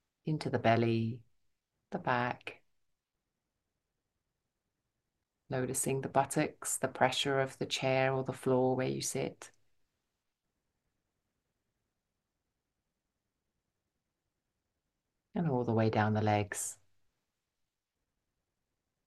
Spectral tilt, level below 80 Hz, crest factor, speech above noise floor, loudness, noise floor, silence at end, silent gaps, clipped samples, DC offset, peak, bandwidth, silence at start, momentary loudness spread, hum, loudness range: -4.5 dB/octave; -72 dBFS; 26 dB; 55 dB; -33 LUFS; -88 dBFS; 2.35 s; none; under 0.1%; under 0.1%; -12 dBFS; 12.5 kHz; 0.25 s; 10 LU; none; 10 LU